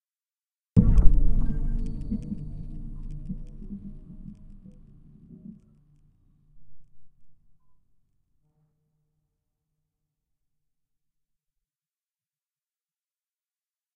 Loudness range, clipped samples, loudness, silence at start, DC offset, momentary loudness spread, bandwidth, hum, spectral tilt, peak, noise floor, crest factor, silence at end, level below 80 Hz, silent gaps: 26 LU; under 0.1%; -29 LUFS; 0.75 s; under 0.1%; 25 LU; 1.7 kHz; none; -10.5 dB/octave; 0 dBFS; under -90 dBFS; 26 dB; 6.65 s; -30 dBFS; none